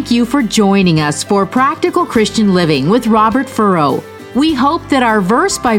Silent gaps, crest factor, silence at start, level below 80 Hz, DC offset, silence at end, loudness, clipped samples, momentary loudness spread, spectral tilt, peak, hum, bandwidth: none; 12 dB; 0 s; -42 dBFS; under 0.1%; 0 s; -12 LUFS; under 0.1%; 3 LU; -5 dB/octave; 0 dBFS; none; 16.5 kHz